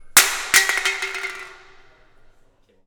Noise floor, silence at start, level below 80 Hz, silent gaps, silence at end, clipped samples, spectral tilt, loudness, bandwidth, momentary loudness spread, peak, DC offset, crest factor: -56 dBFS; 0 s; -52 dBFS; none; 1.3 s; under 0.1%; 2 dB/octave; -18 LUFS; 19.5 kHz; 19 LU; 0 dBFS; under 0.1%; 22 dB